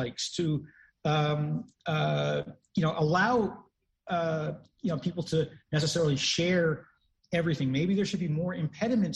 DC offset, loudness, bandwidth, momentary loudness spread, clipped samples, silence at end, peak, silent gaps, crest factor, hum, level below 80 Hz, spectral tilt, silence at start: under 0.1%; -29 LUFS; 11 kHz; 9 LU; under 0.1%; 0 s; -14 dBFS; none; 16 dB; none; -60 dBFS; -5.5 dB/octave; 0 s